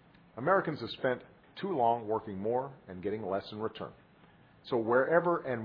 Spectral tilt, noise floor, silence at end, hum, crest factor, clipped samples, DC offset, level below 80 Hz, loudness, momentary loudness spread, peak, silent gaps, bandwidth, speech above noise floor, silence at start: -9 dB/octave; -60 dBFS; 0 s; none; 20 dB; under 0.1%; under 0.1%; -70 dBFS; -32 LUFS; 16 LU; -12 dBFS; none; 5.2 kHz; 29 dB; 0.35 s